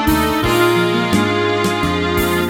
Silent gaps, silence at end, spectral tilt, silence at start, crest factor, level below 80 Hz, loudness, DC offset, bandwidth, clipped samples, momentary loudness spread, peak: none; 0 s; -5 dB/octave; 0 s; 14 dB; -32 dBFS; -15 LUFS; under 0.1%; 18.5 kHz; under 0.1%; 3 LU; -2 dBFS